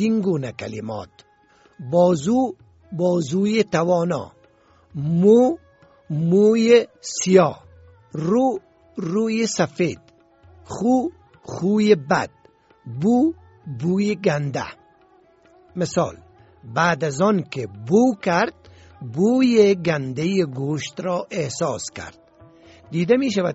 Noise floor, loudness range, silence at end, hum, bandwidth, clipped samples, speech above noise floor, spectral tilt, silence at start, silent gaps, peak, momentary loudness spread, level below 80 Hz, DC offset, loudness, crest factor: -56 dBFS; 6 LU; 0 s; none; 8 kHz; under 0.1%; 36 dB; -6 dB/octave; 0 s; none; -2 dBFS; 17 LU; -58 dBFS; under 0.1%; -20 LUFS; 20 dB